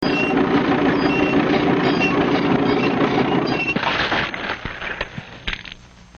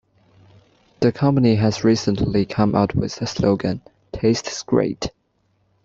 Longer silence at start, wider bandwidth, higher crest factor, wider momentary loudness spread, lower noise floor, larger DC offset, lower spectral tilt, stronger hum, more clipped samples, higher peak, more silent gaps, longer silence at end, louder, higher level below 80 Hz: second, 0 s vs 1 s; second, 7 kHz vs 7.8 kHz; about the same, 14 dB vs 18 dB; about the same, 11 LU vs 9 LU; second, -40 dBFS vs -65 dBFS; neither; about the same, -6.5 dB/octave vs -6.5 dB/octave; neither; neither; second, -6 dBFS vs -2 dBFS; neither; second, 0.45 s vs 0.75 s; about the same, -19 LUFS vs -20 LUFS; about the same, -42 dBFS vs -46 dBFS